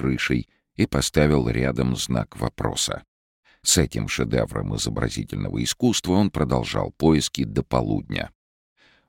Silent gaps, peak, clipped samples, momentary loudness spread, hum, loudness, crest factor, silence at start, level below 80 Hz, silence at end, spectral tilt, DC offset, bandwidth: 3.08-3.43 s; -4 dBFS; under 0.1%; 8 LU; none; -23 LUFS; 18 dB; 0 s; -38 dBFS; 0.8 s; -4.5 dB/octave; under 0.1%; 17 kHz